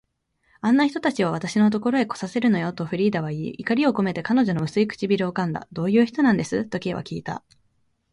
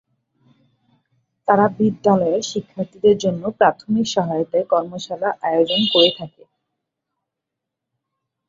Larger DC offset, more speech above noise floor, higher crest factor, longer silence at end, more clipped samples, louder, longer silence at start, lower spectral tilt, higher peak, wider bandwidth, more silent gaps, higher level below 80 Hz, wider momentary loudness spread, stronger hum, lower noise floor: neither; second, 46 dB vs 64 dB; about the same, 16 dB vs 20 dB; second, 0.75 s vs 2.2 s; neither; second, -23 LUFS vs -18 LUFS; second, 0.65 s vs 1.45 s; first, -6.5 dB/octave vs -5 dB/octave; second, -8 dBFS vs -2 dBFS; first, 11 kHz vs 7.6 kHz; neither; about the same, -60 dBFS vs -62 dBFS; about the same, 9 LU vs 11 LU; neither; second, -68 dBFS vs -82 dBFS